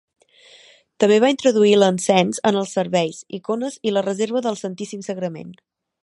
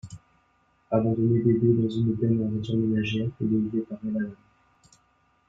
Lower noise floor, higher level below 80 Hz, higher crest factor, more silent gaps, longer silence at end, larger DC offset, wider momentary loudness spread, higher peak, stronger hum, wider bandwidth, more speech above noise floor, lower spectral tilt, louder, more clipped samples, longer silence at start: second, -50 dBFS vs -66 dBFS; second, -70 dBFS vs -58 dBFS; about the same, 20 dB vs 16 dB; neither; second, 0.5 s vs 1.15 s; neither; first, 14 LU vs 9 LU; first, 0 dBFS vs -10 dBFS; neither; first, 11.5 kHz vs 7.8 kHz; second, 31 dB vs 42 dB; second, -5 dB/octave vs -9 dB/octave; first, -19 LUFS vs -26 LUFS; neither; first, 1 s vs 0.05 s